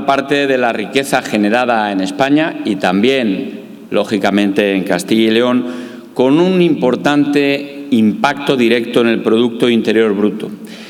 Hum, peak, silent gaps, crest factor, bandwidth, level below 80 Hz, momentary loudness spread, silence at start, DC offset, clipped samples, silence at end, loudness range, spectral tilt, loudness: none; 0 dBFS; none; 14 dB; 16 kHz; -60 dBFS; 7 LU; 0 s; under 0.1%; under 0.1%; 0 s; 2 LU; -5.5 dB/octave; -13 LUFS